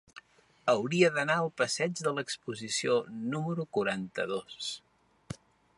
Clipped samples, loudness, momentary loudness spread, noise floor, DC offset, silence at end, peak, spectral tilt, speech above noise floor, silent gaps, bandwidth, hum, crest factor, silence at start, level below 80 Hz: under 0.1%; -31 LUFS; 13 LU; -57 dBFS; under 0.1%; 0.45 s; -10 dBFS; -4 dB/octave; 26 dB; none; 11.5 kHz; none; 22 dB; 0.15 s; -70 dBFS